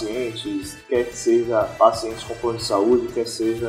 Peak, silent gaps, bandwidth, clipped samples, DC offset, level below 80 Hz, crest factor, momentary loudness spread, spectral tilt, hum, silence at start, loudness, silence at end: 0 dBFS; none; 16 kHz; under 0.1%; under 0.1%; -50 dBFS; 20 dB; 10 LU; -4.5 dB/octave; none; 0 s; -22 LUFS; 0 s